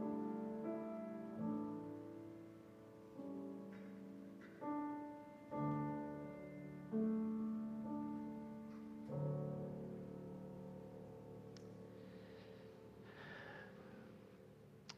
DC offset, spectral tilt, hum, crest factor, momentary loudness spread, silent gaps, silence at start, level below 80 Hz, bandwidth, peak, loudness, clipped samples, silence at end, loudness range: under 0.1%; -8.5 dB/octave; none; 16 dB; 15 LU; none; 0 s; -78 dBFS; 9 kHz; -32 dBFS; -48 LUFS; under 0.1%; 0 s; 11 LU